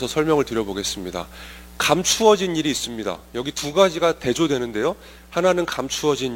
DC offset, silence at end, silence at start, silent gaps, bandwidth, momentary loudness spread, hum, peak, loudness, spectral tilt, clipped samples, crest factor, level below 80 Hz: under 0.1%; 0 s; 0 s; none; 16.5 kHz; 12 LU; none; -2 dBFS; -21 LUFS; -3.5 dB/octave; under 0.1%; 20 dB; -46 dBFS